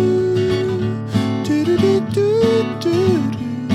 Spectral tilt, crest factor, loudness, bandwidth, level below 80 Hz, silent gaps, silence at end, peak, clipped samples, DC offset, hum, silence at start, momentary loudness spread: -7 dB/octave; 12 dB; -17 LUFS; 13.5 kHz; -48 dBFS; none; 0 s; -4 dBFS; under 0.1%; under 0.1%; none; 0 s; 5 LU